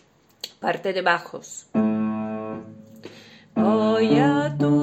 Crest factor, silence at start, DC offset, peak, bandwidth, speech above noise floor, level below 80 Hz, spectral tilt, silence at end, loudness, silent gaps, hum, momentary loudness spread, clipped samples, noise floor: 18 dB; 0.45 s; under 0.1%; -4 dBFS; 14 kHz; 22 dB; -66 dBFS; -6.5 dB/octave; 0 s; -22 LUFS; none; none; 23 LU; under 0.1%; -46 dBFS